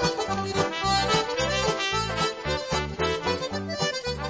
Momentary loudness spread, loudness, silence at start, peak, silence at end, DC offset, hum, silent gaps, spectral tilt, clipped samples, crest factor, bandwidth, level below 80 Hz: 5 LU; -26 LUFS; 0 s; -10 dBFS; 0 s; under 0.1%; none; none; -3.5 dB/octave; under 0.1%; 16 dB; 8 kHz; -42 dBFS